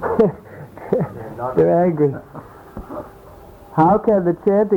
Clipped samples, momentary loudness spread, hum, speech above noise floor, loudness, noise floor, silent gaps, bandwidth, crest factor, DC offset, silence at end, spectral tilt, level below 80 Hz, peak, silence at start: under 0.1%; 23 LU; none; 25 dB; -18 LUFS; -41 dBFS; none; 19.5 kHz; 14 dB; under 0.1%; 0 s; -10.5 dB/octave; -46 dBFS; -4 dBFS; 0 s